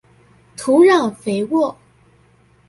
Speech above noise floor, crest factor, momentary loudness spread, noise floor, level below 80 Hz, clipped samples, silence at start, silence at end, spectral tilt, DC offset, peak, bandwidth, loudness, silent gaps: 38 dB; 16 dB; 14 LU; -53 dBFS; -60 dBFS; under 0.1%; 0.6 s; 0.95 s; -5.5 dB/octave; under 0.1%; -2 dBFS; 11.5 kHz; -16 LUFS; none